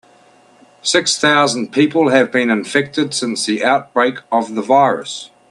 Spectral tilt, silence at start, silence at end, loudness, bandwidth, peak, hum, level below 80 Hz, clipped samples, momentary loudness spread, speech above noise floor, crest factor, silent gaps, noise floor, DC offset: -3.5 dB/octave; 0.85 s; 0.25 s; -15 LUFS; 12 kHz; 0 dBFS; none; -64 dBFS; under 0.1%; 6 LU; 33 dB; 16 dB; none; -49 dBFS; under 0.1%